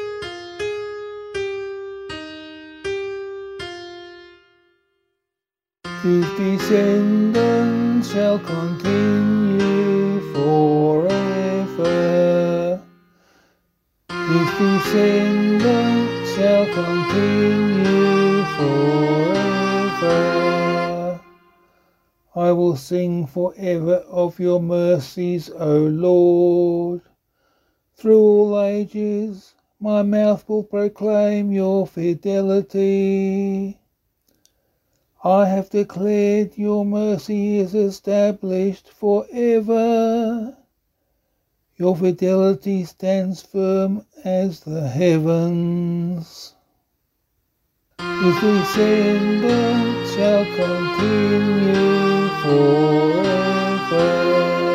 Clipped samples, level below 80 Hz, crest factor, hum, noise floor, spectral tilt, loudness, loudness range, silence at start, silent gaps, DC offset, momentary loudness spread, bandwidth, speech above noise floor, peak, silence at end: under 0.1%; -56 dBFS; 16 dB; none; -88 dBFS; -7 dB/octave; -18 LUFS; 6 LU; 0 s; none; under 0.1%; 12 LU; 14.5 kHz; 70 dB; -4 dBFS; 0 s